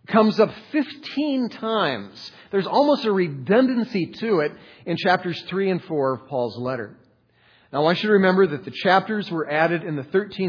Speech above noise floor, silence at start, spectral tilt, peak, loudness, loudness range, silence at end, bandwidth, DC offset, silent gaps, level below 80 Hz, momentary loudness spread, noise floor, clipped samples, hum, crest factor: 37 dB; 0.1 s; -7.5 dB/octave; -2 dBFS; -22 LUFS; 3 LU; 0 s; 5.4 kHz; under 0.1%; none; -70 dBFS; 10 LU; -59 dBFS; under 0.1%; none; 20 dB